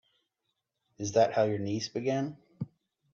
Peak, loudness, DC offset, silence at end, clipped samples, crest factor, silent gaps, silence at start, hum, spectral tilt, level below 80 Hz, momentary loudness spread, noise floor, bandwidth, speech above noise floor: -12 dBFS; -30 LUFS; under 0.1%; 0.5 s; under 0.1%; 20 dB; none; 1 s; none; -5.5 dB/octave; -72 dBFS; 17 LU; -83 dBFS; 7.8 kHz; 54 dB